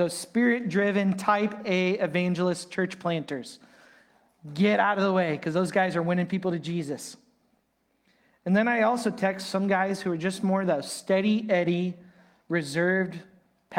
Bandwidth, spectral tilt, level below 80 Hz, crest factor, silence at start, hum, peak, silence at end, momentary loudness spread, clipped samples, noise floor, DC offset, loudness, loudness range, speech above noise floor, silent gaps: 15.5 kHz; -6 dB/octave; -72 dBFS; 18 dB; 0 s; none; -8 dBFS; 0 s; 10 LU; under 0.1%; -72 dBFS; under 0.1%; -26 LUFS; 3 LU; 46 dB; none